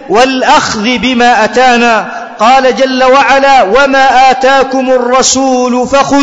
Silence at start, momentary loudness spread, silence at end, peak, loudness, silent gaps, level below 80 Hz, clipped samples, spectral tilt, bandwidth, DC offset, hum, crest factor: 0 s; 4 LU; 0 s; 0 dBFS; -7 LUFS; none; -36 dBFS; 0.3%; -2.5 dB/octave; 8 kHz; 1%; none; 6 dB